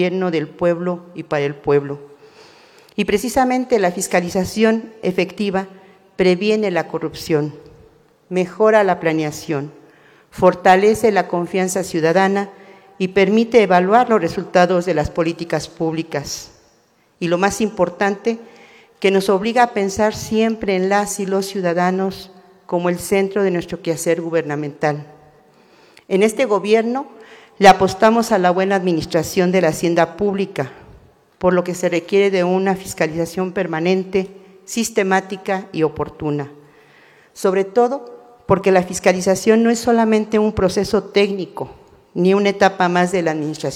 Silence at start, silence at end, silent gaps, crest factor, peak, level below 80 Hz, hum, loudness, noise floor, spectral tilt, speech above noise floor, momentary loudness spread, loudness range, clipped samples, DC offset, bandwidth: 0 s; 0 s; none; 18 dB; 0 dBFS; -48 dBFS; none; -17 LUFS; -57 dBFS; -5.5 dB/octave; 40 dB; 11 LU; 5 LU; under 0.1%; under 0.1%; 16.5 kHz